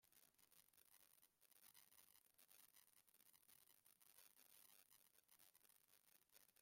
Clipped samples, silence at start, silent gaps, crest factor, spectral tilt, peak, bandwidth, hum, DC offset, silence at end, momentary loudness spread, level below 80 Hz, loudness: under 0.1%; 0 s; none; 26 dB; 0 dB/octave; -48 dBFS; 16.5 kHz; none; under 0.1%; 0 s; 1 LU; under -90 dBFS; -69 LUFS